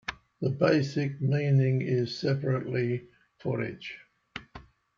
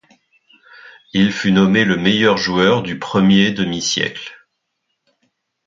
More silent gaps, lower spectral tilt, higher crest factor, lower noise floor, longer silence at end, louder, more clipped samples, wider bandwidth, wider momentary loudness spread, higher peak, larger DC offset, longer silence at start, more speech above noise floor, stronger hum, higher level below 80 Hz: neither; first, -7.5 dB/octave vs -5 dB/octave; about the same, 18 dB vs 16 dB; second, -51 dBFS vs -73 dBFS; second, 0.35 s vs 1.3 s; second, -29 LUFS vs -15 LUFS; neither; about the same, 7.2 kHz vs 7.6 kHz; first, 18 LU vs 9 LU; second, -10 dBFS vs 0 dBFS; neither; second, 0.1 s vs 0.85 s; second, 24 dB vs 58 dB; neither; second, -62 dBFS vs -50 dBFS